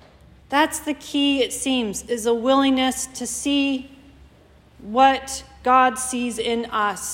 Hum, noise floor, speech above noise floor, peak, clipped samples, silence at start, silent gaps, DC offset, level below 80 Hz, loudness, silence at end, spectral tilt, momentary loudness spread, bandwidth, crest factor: none; -52 dBFS; 31 dB; -4 dBFS; under 0.1%; 0.5 s; none; under 0.1%; -52 dBFS; -21 LUFS; 0 s; -2.5 dB/octave; 9 LU; 16.5 kHz; 18 dB